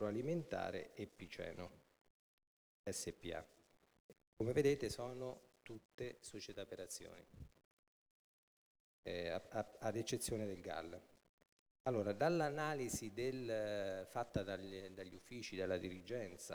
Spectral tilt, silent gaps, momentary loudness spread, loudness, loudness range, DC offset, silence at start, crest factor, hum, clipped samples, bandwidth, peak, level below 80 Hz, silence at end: -5 dB/octave; 2.10-2.38 s, 2.47-2.84 s, 4.00-4.09 s, 4.27-4.37 s, 5.85-5.98 s, 7.65-9.03 s, 11.29-11.38 s, 11.52-11.84 s; 16 LU; -44 LUFS; 10 LU; under 0.1%; 0 s; 22 dB; none; under 0.1%; over 20 kHz; -24 dBFS; -68 dBFS; 0 s